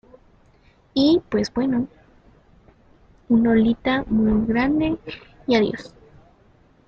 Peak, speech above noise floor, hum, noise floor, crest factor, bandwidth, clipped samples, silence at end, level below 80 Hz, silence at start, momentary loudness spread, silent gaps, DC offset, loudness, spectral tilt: -4 dBFS; 36 dB; none; -56 dBFS; 20 dB; 7 kHz; under 0.1%; 1 s; -44 dBFS; 0.95 s; 13 LU; none; under 0.1%; -21 LUFS; -6.5 dB/octave